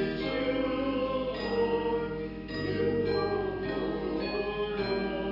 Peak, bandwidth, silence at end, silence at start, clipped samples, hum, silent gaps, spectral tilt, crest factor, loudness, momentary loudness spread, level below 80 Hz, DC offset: -18 dBFS; 5.8 kHz; 0 s; 0 s; under 0.1%; none; none; -8 dB/octave; 12 dB; -31 LUFS; 4 LU; -48 dBFS; under 0.1%